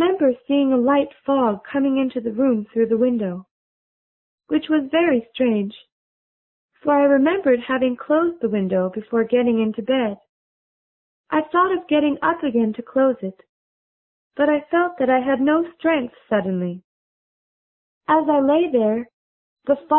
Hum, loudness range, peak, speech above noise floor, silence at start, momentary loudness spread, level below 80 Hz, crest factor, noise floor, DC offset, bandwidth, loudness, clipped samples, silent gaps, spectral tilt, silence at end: none; 3 LU; -4 dBFS; over 71 dB; 0 s; 8 LU; -62 dBFS; 16 dB; under -90 dBFS; under 0.1%; 4 kHz; -20 LUFS; under 0.1%; 3.51-4.38 s, 5.92-6.69 s, 10.29-11.24 s, 13.49-14.31 s, 16.84-18.01 s, 19.13-19.56 s; -11 dB/octave; 0 s